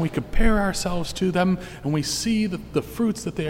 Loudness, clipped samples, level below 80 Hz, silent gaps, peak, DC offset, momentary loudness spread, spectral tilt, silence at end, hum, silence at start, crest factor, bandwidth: -24 LUFS; under 0.1%; -30 dBFS; none; -6 dBFS; under 0.1%; 6 LU; -5 dB/octave; 0 s; none; 0 s; 16 dB; 16 kHz